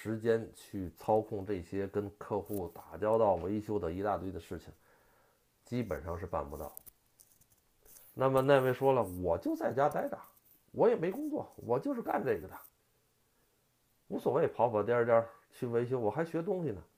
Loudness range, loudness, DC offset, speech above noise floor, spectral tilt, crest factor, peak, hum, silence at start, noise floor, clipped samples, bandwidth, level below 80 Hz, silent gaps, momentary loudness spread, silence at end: 8 LU; -33 LUFS; under 0.1%; 41 dB; -7.5 dB/octave; 22 dB; -12 dBFS; none; 0 s; -74 dBFS; under 0.1%; 15.5 kHz; -62 dBFS; none; 15 LU; 0.15 s